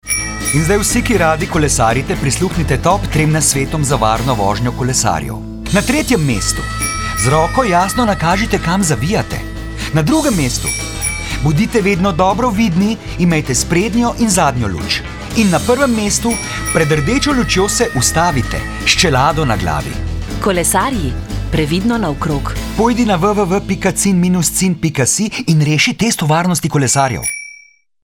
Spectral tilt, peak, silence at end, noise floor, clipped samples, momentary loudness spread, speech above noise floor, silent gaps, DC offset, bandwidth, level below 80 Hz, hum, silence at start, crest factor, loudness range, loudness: -4.5 dB/octave; 0 dBFS; 0.5 s; -44 dBFS; under 0.1%; 6 LU; 30 dB; none; under 0.1%; 19 kHz; -28 dBFS; none; 0.05 s; 14 dB; 2 LU; -14 LUFS